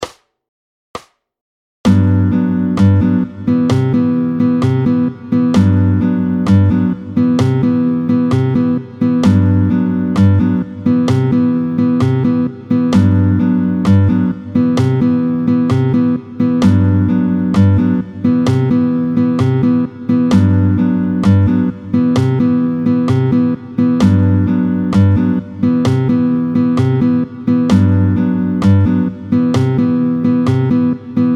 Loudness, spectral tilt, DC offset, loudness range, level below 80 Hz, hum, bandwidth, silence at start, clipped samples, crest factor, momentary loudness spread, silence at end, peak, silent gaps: -13 LUFS; -9 dB/octave; under 0.1%; 1 LU; -42 dBFS; none; 8.6 kHz; 0 s; under 0.1%; 12 dB; 5 LU; 0 s; 0 dBFS; 0.48-0.94 s, 1.41-1.84 s